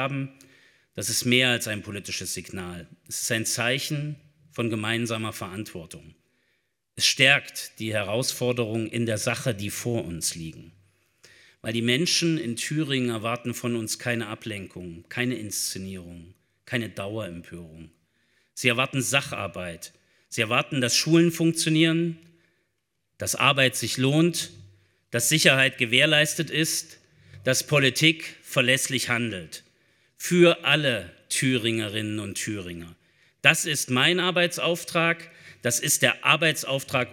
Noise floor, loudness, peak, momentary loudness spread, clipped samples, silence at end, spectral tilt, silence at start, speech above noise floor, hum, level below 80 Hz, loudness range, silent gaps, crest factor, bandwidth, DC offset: -77 dBFS; -24 LUFS; 0 dBFS; 17 LU; under 0.1%; 0 s; -3.5 dB/octave; 0 s; 52 dB; none; -68 dBFS; 8 LU; none; 26 dB; 19 kHz; under 0.1%